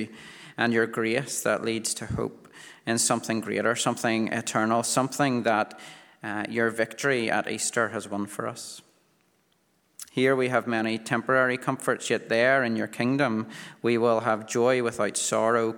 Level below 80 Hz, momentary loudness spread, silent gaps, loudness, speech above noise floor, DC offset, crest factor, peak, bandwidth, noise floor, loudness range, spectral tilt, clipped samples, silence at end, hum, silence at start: -62 dBFS; 11 LU; none; -26 LUFS; 42 dB; under 0.1%; 20 dB; -6 dBFS; 20 kHz; -68 dBFS; 4 LU; -4 dB/octave; under 0.1%; 0 s; none; 0 s